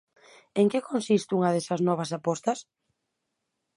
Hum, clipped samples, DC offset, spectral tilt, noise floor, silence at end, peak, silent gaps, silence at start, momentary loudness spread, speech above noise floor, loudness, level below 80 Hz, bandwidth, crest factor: none; under 0.1%; under 0.1%; -6 dB/octave; -81 dBFS; 1.15 s; -10 dBFS; none; 0.55 s; 6 LU; 55 dB; -27 LUFS; -76 dBFS; 11.5 kHz; 18 dB